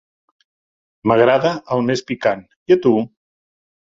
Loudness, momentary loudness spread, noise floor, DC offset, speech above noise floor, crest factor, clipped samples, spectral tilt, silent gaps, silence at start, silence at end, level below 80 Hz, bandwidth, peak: -17 LUFS; 10 LU; under -90 dBFS; under 0.1%; over 74 dB; 18 dB; under 0.1%; -6.5 dB/octave; 2.56-2.66 s; 1.05 s; 0.9 s; -58 dBFS; 7.6 kHz; -2 dBFS